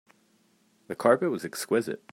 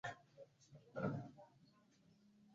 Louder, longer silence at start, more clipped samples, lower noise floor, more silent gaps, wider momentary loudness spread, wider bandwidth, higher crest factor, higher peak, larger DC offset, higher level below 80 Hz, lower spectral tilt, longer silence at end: first, -27 LUFS vs -49 LUFS; first, 0.9 s vs 0.05 s; neither; second, -66 dBFS vs -73 dBFS; neither; second, 9 LU vs 21 LU; first, 16 kHz vs 7.4 kHz; about the same, 22 dB vs 22 dB; first, -8 dBFS vs -30 dBFS; neither; about the same, -78 dBFS vs -80 dBFS; second, -5 dB/octave vs -6.5 dB/octave; first, 0.15 s vs 0 s